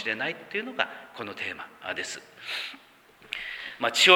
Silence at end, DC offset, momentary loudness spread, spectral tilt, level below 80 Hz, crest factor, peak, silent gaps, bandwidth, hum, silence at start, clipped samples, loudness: 0 s; under 0.1%; 10 LU; -1.5 dB/octave; -72 dBFS; 26 dB; -4 dBFS; none; over 20 kHz; none; 0 s; under 0.1%; -31 LUFS